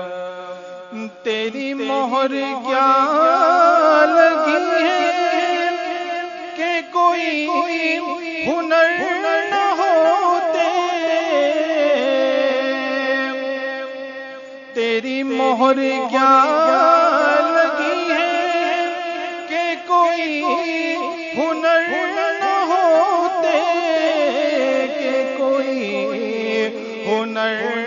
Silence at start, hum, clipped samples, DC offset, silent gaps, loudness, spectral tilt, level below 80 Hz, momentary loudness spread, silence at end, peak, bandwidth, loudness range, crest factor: 0 s; none; under 0.1%; under 0.1%; none; -17 LUFS; -3.5 dB/octave; -70 dBFS; 11 LU; 0 s; 0 dBFS; 7.4 kHz; 5 LU; 18 dB